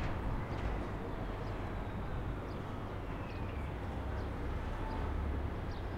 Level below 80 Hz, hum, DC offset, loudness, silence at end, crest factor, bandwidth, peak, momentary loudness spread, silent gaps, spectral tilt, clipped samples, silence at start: -42 dBFS; none; under 0.1%; -41 LUFS; 0 s; 14 dB; 15 kHz; -24 dBFS; 3 LU; none; -7.5 dB/octave; under 0.1%; 0 s